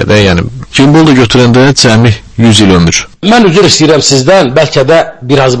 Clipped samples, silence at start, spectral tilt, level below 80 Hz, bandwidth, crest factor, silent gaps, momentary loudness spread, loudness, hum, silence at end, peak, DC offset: 6%; 0 s; -5 dB/octave; -30 dBFS; 11 kHz; 6 dB; none; 5 LU; -5 LUFS; none; 0 s; 0 dBFS; under 0.1%